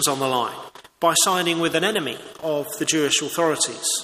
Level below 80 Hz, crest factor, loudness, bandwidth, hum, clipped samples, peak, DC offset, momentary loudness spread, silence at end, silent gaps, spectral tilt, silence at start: -66 dBFS; 18 dB; -21 LUFS; 15.5 kHz; none; under 0.1%; -6 dBFS; under 0.1%; 10 LU; 0 s; none; -2 dB/octave; 0 s